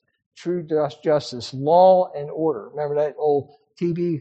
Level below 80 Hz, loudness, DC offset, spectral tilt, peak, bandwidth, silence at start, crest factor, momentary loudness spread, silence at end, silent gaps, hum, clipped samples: -66 dBFS; -21 LUFS; under 0.1%; -7 dB/octave; -4 dBFS; 8.4 kHz; 0.4 s; 16 dB; 13 LU; 0 s; none; none; under 0.1%